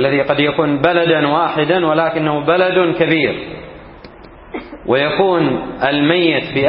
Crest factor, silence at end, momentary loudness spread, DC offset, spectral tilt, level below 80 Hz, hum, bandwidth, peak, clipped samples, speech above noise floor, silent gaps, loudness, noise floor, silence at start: 16 dB; 0 s; 15 LU; under 0.1%; -11 dB/octave; -46 dBFS; none; 5.6 kHz; 0 dBFS; under 0.1%; 23 dB; none; -14 LUFS; -37 dBFS; 0 s